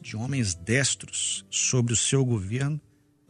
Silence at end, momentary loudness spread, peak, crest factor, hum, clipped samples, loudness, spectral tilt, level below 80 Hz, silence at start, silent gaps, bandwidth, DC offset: 0.5 s; 7 LU; -8 dBFS; 18 dB; none; under 0.1%; -25 LUFS; -3.5 dB/octave; -56 dBFS; 0.05 s; none; 11.5 kHz; under 0.1%